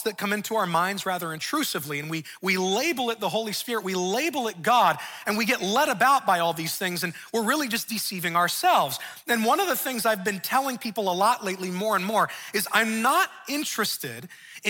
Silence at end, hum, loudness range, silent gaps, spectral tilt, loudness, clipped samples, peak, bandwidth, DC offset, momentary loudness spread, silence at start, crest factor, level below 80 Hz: 0 s; none; 3 LU; none; -3 dB/octave; -25 LUFS; under 0.1%; -6 dBFS; 18 kHz; under 0.1%; 8 LU; 0 s; 20 dB; -74 dBFS